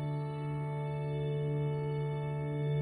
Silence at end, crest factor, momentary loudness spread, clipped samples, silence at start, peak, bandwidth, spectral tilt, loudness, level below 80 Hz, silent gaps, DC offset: 0 s; 10 dB; 3 LU; under 0.1%; 0 s; -24 dBFS; 9.4 kHz; -9.5 dB/octave; -36 LUFS; -60 dBFS; none; under 0.1%